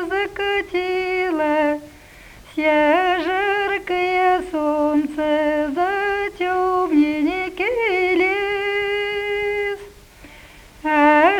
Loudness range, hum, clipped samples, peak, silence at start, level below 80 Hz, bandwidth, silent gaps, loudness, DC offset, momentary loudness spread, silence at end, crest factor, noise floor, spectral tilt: 2 LU; none; under 0.1%; -2 dBFS; 0 s; -48 dBFS; 16.5 kHz; none; -19 LUFS; under 0.1%; 6 LU; 0 s; 18 dB; -43 dBFS; -4.5 dB/octave